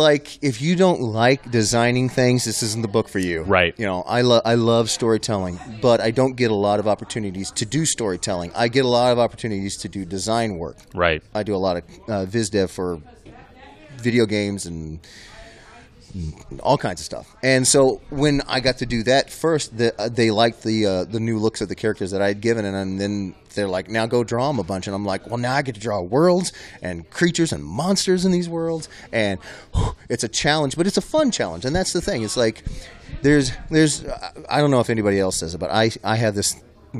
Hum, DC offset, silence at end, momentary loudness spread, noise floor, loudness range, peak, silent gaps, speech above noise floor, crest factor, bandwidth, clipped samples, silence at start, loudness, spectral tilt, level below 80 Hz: none; under 0.1%; 0 s; 11 LU; -46 dBFS; 5 LU; 0 dBFS; none; 25 dB; 20 dB; 14.5 kHz; under 0.1%; 0 s; -21 LUFS; -4.5 dB/octave; -42 dBFS